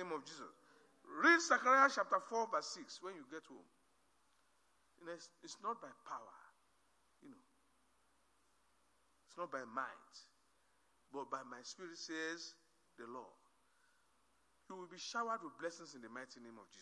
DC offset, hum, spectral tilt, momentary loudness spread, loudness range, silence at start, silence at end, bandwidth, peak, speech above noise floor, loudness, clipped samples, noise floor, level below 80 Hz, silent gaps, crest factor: under 0.1%; none; -2 dB/octave; 25 LU; 17 LU; 0 s; 0 s; 11 kHz; -16 dBFS; 37 dB; -38 LUFS; under 0.1%; -78 dBFS; under -90 dBFS; none; 26 dB